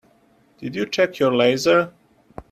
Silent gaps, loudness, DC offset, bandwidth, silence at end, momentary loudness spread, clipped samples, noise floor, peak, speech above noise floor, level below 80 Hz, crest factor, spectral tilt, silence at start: none; -20 LUFS; under 0.1%; 14 kHz; 0.1 s; 14 LU; under 0.1%; -58 dBFS; -4 dBFS; 39 dB; -58 dBFS; 18 dB; -4.5 dB/octave; 0.6 s